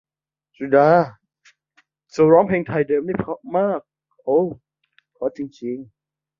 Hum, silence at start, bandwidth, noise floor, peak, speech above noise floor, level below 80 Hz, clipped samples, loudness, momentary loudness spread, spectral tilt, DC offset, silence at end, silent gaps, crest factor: none; 0.6 s; 7.4 kHz; -75 dBFS; -2 dBFS; 56 dB; -58 dBFS; under 0.1%; -20 LUFS; 16 LU; -8.5 dB/octave; under 0.1%; 0.55 s; none; 20 dB